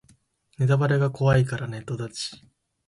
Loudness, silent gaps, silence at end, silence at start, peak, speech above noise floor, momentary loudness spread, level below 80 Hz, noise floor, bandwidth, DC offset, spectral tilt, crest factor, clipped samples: -24 LUFS; none; 0.5 s; 0.6 s; -8 dBFS; 38 dB; 12 LU; -52 dBFS; -61 dBFS; 11.5 kHz; under 0.1%; -6.5 dB/octave; 16 dB; under 0.1%